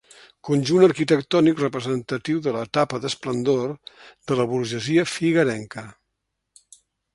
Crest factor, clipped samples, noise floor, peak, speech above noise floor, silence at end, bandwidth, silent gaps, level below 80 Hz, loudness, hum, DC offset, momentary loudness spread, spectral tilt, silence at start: 20 dB; under 0.1%; -78 dBFS; -2 dBFS; 57 dB; 1.25 s; 11.5 kHz; none; -62 dBFS; -22 LUFS; none; under 0.1%; 14 LU; -6 dB/octave; 0.45 s